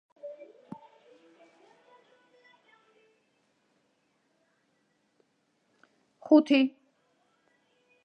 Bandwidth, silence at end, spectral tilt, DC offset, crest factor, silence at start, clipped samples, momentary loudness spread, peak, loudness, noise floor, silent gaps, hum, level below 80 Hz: 6.6 kHz; 1.35 s; -5.5 dB/octave; under 0.1%; 24 dB; 0.25 s; under 0.1%; 28 LU; -10 dBFS; -24 LUFS; -74 dBFS; none; none; under -90 dBFS